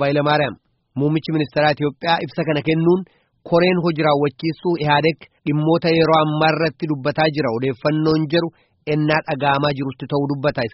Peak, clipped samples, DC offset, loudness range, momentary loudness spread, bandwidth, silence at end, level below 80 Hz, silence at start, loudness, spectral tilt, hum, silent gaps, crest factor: -2 dBFS; under 0.1%; under 0.1%; 2 LU; 7 LU; 6 kHz; 0.05 s; -52 dBFS; 0 s; -19 LUFS; -5 dB/octave; none; none; 16 dB